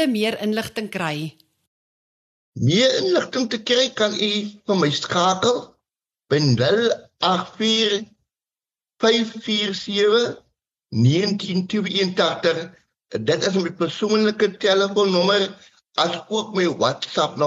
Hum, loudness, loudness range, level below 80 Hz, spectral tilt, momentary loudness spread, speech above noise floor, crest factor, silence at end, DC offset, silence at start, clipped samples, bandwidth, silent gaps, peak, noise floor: none; -20 LUFS; 2 LU; -64 dBFS; -4.5 dB/octave; 9 LU; over 70 dB; 18 dB; 0 s; under 0.1%; 0 s; under 0.1%; 13 kHz; 1.67-2.53 s; -4 dBFS; under -90 dBFS